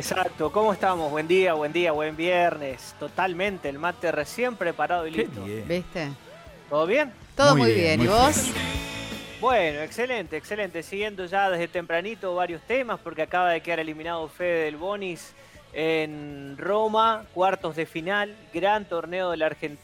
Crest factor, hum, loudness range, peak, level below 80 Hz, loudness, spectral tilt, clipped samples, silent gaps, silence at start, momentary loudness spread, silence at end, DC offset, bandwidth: 20 dB; none; 6 LU; -6 dBFS; -50 dBFS; -25 LUFS; -4.5 dB/octave; under 0.1%; none; 0 s; 12 LU; 0.1 s; under 0.1%; 16 kHz